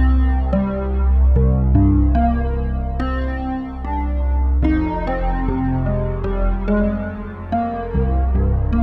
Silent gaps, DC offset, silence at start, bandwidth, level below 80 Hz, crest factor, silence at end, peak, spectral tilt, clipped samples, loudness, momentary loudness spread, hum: none; under 0.1%; 0 s; 3.6 kHz; -18 dBFS; 12 dB; 0 s; -4 dBFS; -11 dB/octave; under 0.1%; -19 LUFS; 8 LU; none